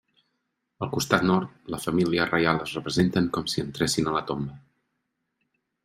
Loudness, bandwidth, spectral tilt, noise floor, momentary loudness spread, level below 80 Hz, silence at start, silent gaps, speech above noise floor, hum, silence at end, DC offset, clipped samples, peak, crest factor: -25 LUFS; 16 kHz; -5 dB/octave; -79 dBFS; 10 LU; -56 dBFS; 0.8 s; none; 53 dB; none; 1.25 s; under 0.1%; under 0.1%; -4 dBFS; 24 dB